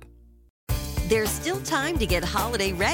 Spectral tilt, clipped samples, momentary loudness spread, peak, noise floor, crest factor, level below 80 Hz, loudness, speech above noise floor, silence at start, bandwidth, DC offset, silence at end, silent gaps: -4 dB/octave; under 0.1%; 7 LU; -10 dBFS; -51 dBFS; 16 dB; -34 dBFS; -25 LUFS; 26 dB; 0 s; 17 kHz; under 0.1%; 0 s; 0.50-0.67 s